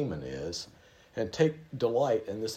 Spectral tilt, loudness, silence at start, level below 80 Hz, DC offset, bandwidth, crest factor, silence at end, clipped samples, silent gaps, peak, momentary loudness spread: -5.5 dB/octave; -31 LUFS; 0 s; -60 dBFS; under 0.1%; 15 kHz; 20 dB; 0 s; under 0.1%; none; -12 dBFS; 11 LU